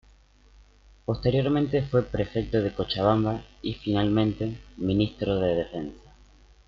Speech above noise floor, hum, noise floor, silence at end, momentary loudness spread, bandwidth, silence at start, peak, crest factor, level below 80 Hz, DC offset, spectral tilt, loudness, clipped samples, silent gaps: 31 dB; 50 Hz at -45 dBFS; -56 dBFS; 0.7 s; 10 LU; 7 kHz; 1.1 s; -8 dBFS; 18 dB; -46 dBFS; under 0.1%; -8.5 dB/octave; -26 LUFS; under 0.1%; none